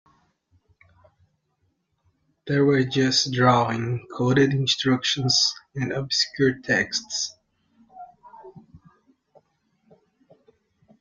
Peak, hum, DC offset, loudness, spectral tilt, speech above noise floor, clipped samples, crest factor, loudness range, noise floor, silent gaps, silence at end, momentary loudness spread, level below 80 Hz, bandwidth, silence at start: -6 dBFS; none; under 0.1%; -22 LUFS; -4 dB/octave; 49 dB; under 0.1%; 20 dB; 9 LU; -72 dBFS; none; 2.25 s; 9 LU; -60 dBFS; 8.8 kHz; 2.45 s